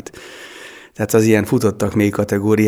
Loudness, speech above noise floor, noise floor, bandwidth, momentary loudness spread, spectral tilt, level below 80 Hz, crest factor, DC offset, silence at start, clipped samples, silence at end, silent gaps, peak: -16 LUFS; 23 dB; -38 dBFS; over 20 kHz; 21 LU; -6.5 dB/octave; -50 dBFS; 16 dB; under 0.1%; 0.15 s; under 0.1%; 0 s; none; 0 dBFS